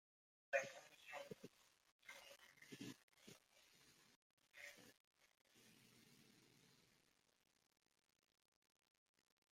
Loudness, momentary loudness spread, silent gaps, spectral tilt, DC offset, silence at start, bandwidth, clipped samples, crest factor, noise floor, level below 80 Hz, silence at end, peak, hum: -53 LUFS; 24 LU; 1.92-1.99 s, 3.03-3.08 s, 4.16-4.37 s, 5.00-5.11 s; -3 dB/octave; under 0.1%; 0.5 s; 16 kHz; under 0.1%; 32 dB; -81 dBFS; under -90 dBFS; 2.6 s; -28 dBFS; none